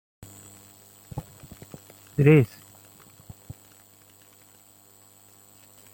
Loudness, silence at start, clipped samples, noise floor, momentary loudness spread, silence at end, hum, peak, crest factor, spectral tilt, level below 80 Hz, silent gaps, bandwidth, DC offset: -21 LUFS; 1.15 s; under 0.1%; -55 dBFS; 30 LU; 3.5 s; 50 Hz at -55 dBFS; -6 dBFS; 22 dB; -7.5 dB/octave; -58 dBFS; none; 16.5 kHz; under 0.1%